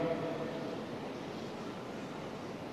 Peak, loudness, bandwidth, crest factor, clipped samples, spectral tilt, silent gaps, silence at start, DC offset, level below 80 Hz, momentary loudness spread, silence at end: -24 dBFS; -41 LUFS; 13.5 kHz; 16 dB; under 0.1%; -6 dB/octave; none; 0 s; under 0.1%; -72 dBFS; 6 LU; 0 s